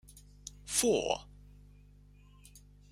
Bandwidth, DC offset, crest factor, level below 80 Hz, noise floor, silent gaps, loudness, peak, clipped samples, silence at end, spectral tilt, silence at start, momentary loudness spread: 16 kHz; under 0.1%; 22 dB; -58 dBFS; -58 dBFS; none; -31 LUFS; -14 dBFS; under 0.1%; 0.35 s; -2.5 dB/octave; 0.15 s; 21 LU